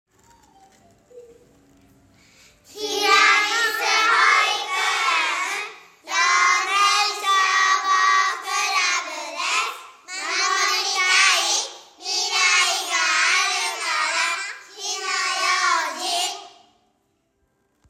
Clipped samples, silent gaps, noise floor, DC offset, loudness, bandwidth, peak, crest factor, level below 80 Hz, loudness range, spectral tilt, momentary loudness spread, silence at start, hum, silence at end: under 0.1%; none; -69 dBFS; under 0.1%; -19 LUFS; 16 kHz; -4 dBFS; 18 dB; -74 dBFS; 5 LU; 2.5 dB/octave; 12 LU; 1.15 s; none; 1.4 s